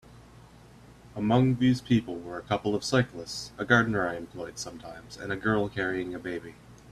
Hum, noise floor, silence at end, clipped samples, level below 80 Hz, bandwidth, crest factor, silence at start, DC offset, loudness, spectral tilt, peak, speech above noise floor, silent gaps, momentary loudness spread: none; -52 dBFS; 0 s; under 0.1%; -56 dBFS; 13.5 kHz; 22 dB; 0.1 s; under 0.1%; -28 LUFS; -6 dB/octave; -6 dBFS; 24 dB; none; 15 LU